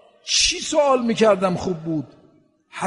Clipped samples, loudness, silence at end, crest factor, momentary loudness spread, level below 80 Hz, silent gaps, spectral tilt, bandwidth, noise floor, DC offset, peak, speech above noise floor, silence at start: under 0.1%; -19 LUFS; 0 s; 18 dB; 11 LU; -48 dBFS; none; -3 dB/octave; 11 kHz; -56 dBFS; under 0.1%; -4 dBFS; 37 dB; 0.25 s